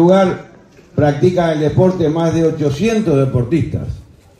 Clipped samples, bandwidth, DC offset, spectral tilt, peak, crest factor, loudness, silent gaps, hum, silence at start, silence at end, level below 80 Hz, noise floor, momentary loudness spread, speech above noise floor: under 0.1%; 11 kHz; under 0.1%; -7.5 dB/octave; -2 dBFS; 14 dB; -15 LUFS; none; none; 0 s; 0.4 s; -40 dBFS; -39 dBFS; 11 LU; 25 dB